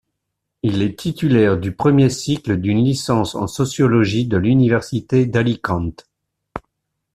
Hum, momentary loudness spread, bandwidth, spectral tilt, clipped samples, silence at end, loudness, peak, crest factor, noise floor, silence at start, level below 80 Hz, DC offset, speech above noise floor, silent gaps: none; 9 LU; 14 kHz; -6.5 dB/octave; under 0.1%; 0.55 s; -18 LUFS; -2 dBFS; 16 dB; -77 dBFS; 0.65 s; -46 dBFS; under 0.1%; 61 dB; none